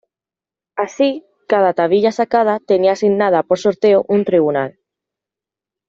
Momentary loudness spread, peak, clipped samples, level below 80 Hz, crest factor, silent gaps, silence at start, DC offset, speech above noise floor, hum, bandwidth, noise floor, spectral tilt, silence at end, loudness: 10 LU; -2 dBFS; under 0.1%; -62 dBFS; 14 dB; none; 0.75 s; under 0.1%; 75 dB; none; 7.6 kHz; -89 dBFS; -6 dB/octave; 1.2 s; -15 LUFS